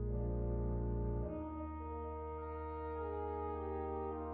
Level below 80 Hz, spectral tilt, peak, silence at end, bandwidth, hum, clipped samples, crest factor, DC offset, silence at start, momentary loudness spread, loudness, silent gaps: -44 dBFS; -10 dB/octave; -26 dBFS; 0 s; 3.6 kHz; none; under 0.1%; 14 dB; under 0.1%; 0 s; 6 LU; -42 LUFS; none